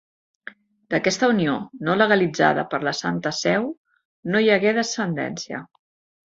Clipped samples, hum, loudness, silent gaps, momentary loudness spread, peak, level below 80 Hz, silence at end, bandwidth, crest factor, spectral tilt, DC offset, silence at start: under 0.1%; none; -21 LUFS; 3.77-3.84 s, 4.05-4.23 s; 17 LU; -2 dBFS; -64 dBFS; 0.65 s; 7.8 kHz; 20 dB; -4.5 dB/octave; under 0.1%; 0.9 s